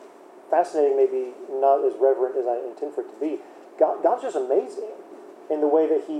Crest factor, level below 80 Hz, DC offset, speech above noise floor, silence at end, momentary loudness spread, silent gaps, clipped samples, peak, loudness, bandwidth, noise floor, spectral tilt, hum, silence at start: 18 dB; under -90 dBFS; under 0.1%; 24 dB; 0 s; 14 LU; none; under 0.1%; -6 dBFS; -23 LUFS; 10 kHz; -46 dBFS; -5 dB/octave; none; 0 s